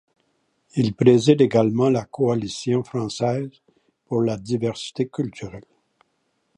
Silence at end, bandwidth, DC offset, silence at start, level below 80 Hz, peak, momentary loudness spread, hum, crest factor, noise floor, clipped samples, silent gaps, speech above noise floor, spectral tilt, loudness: 0.95 s; 10.5 kHz; under 0.1%; 0.75 s; -58 dBFS; -2 dBFS; 13 LU; none; 20 dB; -71 dBFS; under 0.1%; none; 50 dB; -7 dB/octave; -21 LUFS